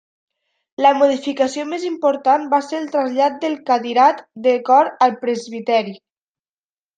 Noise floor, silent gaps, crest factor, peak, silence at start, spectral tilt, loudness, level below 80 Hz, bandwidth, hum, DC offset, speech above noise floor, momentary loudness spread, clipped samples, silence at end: under -90 dBFS; none; 16 dB; -2 dBFS; 0.8 s; -4 dB/octave; -17 LUFS; -72 dBFS; 9.2 kHz; none; under 0.1%; over 73 dB; 10 LU; under 0.1%; 1 s